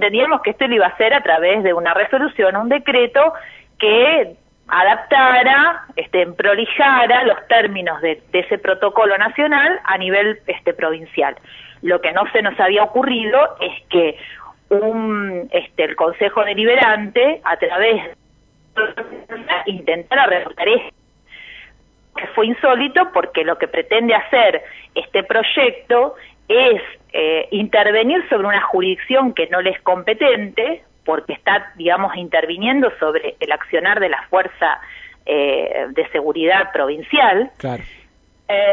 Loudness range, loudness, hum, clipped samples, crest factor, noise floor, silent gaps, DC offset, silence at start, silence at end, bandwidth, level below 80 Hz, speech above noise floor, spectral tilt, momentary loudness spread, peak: 5 LU; -16 LUFS; none; under 0.1%; 16 dB; -53 dBFS; none; under 0.1%; 0 s; 0 s; 4.3 kHz; -56 dBFS; 38 dB; -6.5 dB/octave; 9 LU; -2 dBFS